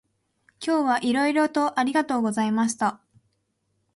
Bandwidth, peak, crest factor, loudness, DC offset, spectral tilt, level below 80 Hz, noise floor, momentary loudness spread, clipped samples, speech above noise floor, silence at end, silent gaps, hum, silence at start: 11.5 kHz; -10 dBFS; 16 dB; -24 LUFS; under 0.1%; -4 dB/octave; -70 dBFS; -73 dBFS; 5 LU; under 0.1%; 50 dB; 1 s; none; none; 0.6 s